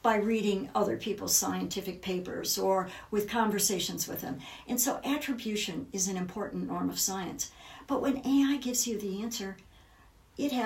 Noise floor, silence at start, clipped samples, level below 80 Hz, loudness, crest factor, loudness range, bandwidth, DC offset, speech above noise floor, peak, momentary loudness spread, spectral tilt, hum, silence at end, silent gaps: -59 dBFS; 0.05 s; under 0.1%; -62 dBFS; -31 LUFS; 20 dB; 3 LU; 16.5 kHz; under 0.1%; 28 dB; -10 dBFS; 10 LU; -3 dB/octave; none; 0 s; none